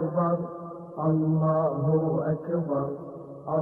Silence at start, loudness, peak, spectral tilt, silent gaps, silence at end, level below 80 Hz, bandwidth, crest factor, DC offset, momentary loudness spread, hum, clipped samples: 0 s; -27 LUFS; -14 dBFS; -13 dB/octave; none; 0 s; -64 dBFS; 2 kHz; 12 dB; under 0.1%; 15 LU; none; under 0.1%